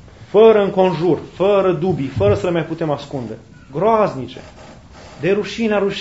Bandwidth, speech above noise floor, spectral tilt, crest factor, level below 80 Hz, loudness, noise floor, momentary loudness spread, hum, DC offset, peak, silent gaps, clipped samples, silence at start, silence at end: 8 kHz; 23 dB; -7 dB/octave; 18 dB; -46 dBFS; -16 LUFS; -39 dBFS; 18 LU; none; 0.2%; 0 dBFS; none; under 0.1%; 0.05 s; 0 s